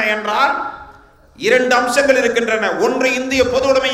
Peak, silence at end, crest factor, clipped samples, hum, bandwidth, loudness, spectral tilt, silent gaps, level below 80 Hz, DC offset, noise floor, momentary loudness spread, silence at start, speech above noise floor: 0 dBFS; 0 s; 16 dB; under 0.1%; none; 15.5 kHz; -15 LUFS; -3 dB/octave; none; -48 dBFS; under 0.1%; -44 dBFS; 8 LU; 0 s; 29 dB